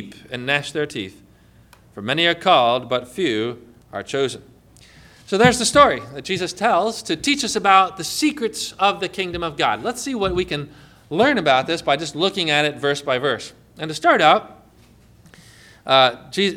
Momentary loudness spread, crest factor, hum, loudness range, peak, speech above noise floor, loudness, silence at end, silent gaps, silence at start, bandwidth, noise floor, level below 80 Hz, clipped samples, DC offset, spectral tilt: 14 LU; 20 dB; none; 3 LU; 0 dBFS; 32 dB; -19 LUFS; 0 s; none; 0 s; 16.5 kHz; -51 dBFS; -50 dBFS; under 0.1%; under 0.1%; -3.5 dB/octave